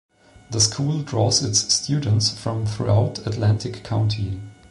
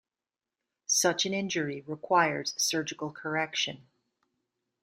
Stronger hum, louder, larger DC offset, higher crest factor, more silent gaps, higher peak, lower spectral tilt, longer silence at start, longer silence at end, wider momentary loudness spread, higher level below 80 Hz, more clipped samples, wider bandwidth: neither; first, -21 LUFS vs -29 LUFS; neither; second, 16 dB vs 22 dB; neither; first, -6 dBFS vs -10 dBFS; first, -4 dB/octave vs -2 dB/octave; second, 0.5 s vs 0.9 s; second, 0.15 s vs 1.05 s; second, 8 LU vs 12 LU; first, -44 dBFS vs -76 dBFS; neither; second, 11.5 kHz vs 15.5 kHz